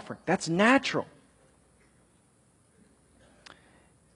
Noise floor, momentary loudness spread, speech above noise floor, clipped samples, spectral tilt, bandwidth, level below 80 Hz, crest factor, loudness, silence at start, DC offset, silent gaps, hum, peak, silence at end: -64 dBFS; 12 LU; 38 dB; under 0.1%; -4.5 dB/octave; 11.5 kHz; -68 dBFS; 22 dB; -26 LUFS; 0.05 s; under 0.1%; none; none; -8 dBFS; 3.1 s